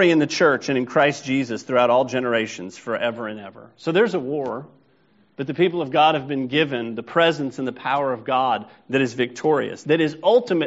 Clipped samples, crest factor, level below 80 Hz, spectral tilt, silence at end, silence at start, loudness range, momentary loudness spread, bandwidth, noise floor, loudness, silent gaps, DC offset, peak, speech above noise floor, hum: under 0.1%; 18 dB; -66 dBFS; -3.5 dB/octave; 0 s; 0 s; 4 LU; 12 LU; 8 kHz; -59 dBFS; -21 LUFS; none; under 0.1%; -4 dBFS; 39 dB; none